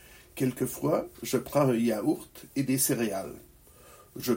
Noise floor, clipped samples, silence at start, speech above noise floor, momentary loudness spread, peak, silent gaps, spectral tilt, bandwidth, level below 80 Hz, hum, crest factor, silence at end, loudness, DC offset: -54 dBFS; under 0.1%; 0.1 s; 26 dB; 14 LU; -10 dBFS; none; -5 dB/octave; 16.5 kHz; -60 dBFS; none; 20 dB; 0 s; -29 LUFS; under 0.1%